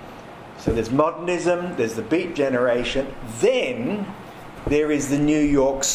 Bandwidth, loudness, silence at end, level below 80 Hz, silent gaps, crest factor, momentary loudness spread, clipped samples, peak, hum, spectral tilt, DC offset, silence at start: 15.5 kHz; -22 LUFS; 0 s; -40 dBFS; none; 18 dB; 14 LU; under 0.1%; -4 dBFS; none; -4.5 dB/octave; under 0.1%; 0 s